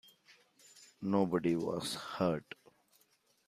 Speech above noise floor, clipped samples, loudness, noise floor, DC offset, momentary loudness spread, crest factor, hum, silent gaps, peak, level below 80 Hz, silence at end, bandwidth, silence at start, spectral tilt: 39 dB; under 0.1%; -35 LUFS; -73 dBFS; under 0.1%; 21 LU; 20 dB; none; none; -18 dBFS; -72 dBFS; 1.05 s; 15 kHz; 0.75 s; -6 dB/octave